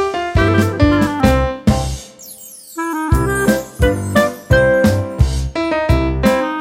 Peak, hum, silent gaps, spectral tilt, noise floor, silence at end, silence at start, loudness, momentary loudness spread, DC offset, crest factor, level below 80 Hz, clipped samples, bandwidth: 0 dBFS; none; none; -6 dB/octave; -36 dBFS; 0 s; 0 s; -15 LUFS; 11 LU; under 0.1%; 14 dB; -24 dBFS; under 0.1%; 16.5 kHz